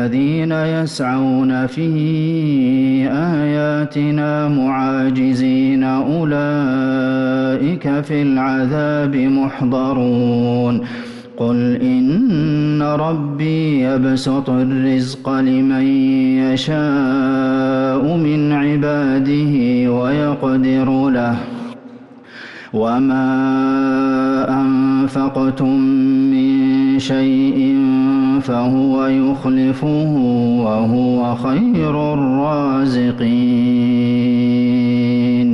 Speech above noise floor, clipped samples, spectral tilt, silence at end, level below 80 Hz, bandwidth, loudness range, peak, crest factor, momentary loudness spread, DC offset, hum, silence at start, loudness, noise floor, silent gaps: 23 dB; under 0.1%; -8 dB/octave; 0 s; -50 dBFS; 7.6 kHz; 2 LU; -8 dBFS; 8 dB; 4 LU; under 0.1%; none; 0 s; -16 LUFS; -38 dBFS; none